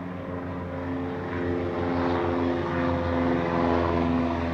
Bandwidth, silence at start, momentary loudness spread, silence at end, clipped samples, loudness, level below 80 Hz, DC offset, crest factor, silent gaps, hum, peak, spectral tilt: 7 kHz; 0 s; 9 LU; 0 s; under 0.1%; -27 LUFS; -48 dBFS; under 0.1%; 16 dB; none; none; -10 dBFS; -8.5 dB/octave